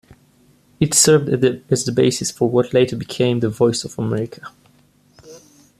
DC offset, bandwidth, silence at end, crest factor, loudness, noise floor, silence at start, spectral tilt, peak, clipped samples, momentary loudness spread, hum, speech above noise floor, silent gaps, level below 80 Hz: under 0.1%; 14.5 kHz; 0.4 s; 20 dB; -17 LUFS; -55 dBFS; 0.8 s; -4.5 dB/octave; 0 dBFS; under 0.1%; 10 LU; none; 37 dB; none; -54 dBFS